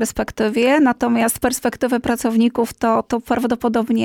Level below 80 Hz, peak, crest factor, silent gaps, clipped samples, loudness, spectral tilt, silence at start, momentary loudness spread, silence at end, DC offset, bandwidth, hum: -44 dBFS; -6 dBFS; 12 dB; none; under 0.1%; -18 LUFS; -4.5 dB/octave; 0 s; 5 LU; 0 s; under 0.1%; 17.5 kHz; none